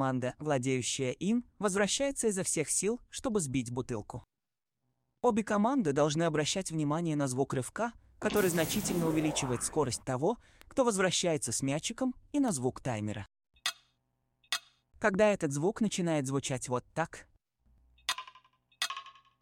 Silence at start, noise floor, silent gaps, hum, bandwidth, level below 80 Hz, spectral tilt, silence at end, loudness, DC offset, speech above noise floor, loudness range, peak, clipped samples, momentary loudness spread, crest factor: 0 s; under -90 dBFS; none; none; 16 kHz; -60 dBFS; -4 dB/octave; 0.3 s; -32 LUFS; under 0.1%; over 59 dB; 4 LU; -14 dBFS; under 0.1%; 9 LU; 20 dB